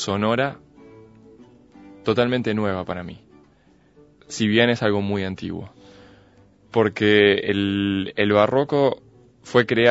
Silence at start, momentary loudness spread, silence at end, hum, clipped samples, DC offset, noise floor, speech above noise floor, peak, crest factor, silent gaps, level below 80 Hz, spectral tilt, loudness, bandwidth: 0 s; 15 LU; 0 s; none; under 0.1%; under 0.1%; -56 dBFS; 36 dB; -2 dBFS; 20 dB; none; -58 dBFS; -5.5 dB/octave; -21 LUFS; 8 kHz